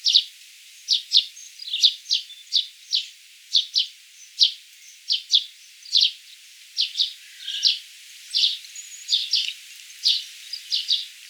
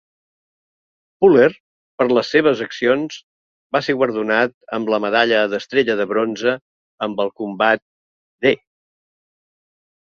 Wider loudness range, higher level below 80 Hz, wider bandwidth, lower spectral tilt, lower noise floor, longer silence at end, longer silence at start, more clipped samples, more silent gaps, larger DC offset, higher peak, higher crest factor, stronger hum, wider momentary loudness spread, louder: about the same, 2 LU vs 4 LU; second, under -90 dBFS vs -62 dBFS; first, over 20 kHz vs 7 kHz; second, 11.5 dB/octave vs -5.5 dB/octave; second, -47 dBFS vs under -90 dBFS; second, 0 s vs 1.5 s; second, 0 s vs 1.2 s; neither; second, none vs 1.60-1.98 s, 3.23-3.70 s, 4.54-4.61 s, 6.61-6.98 s, 7.82-8.39 s; neither; about the same, -4 dBFS vs -2 dBFS; about the same, 22 dB vs 18 dB; neither; first, 19 LU vs 10 LU; second, -21 LUFS vs -18 LUFS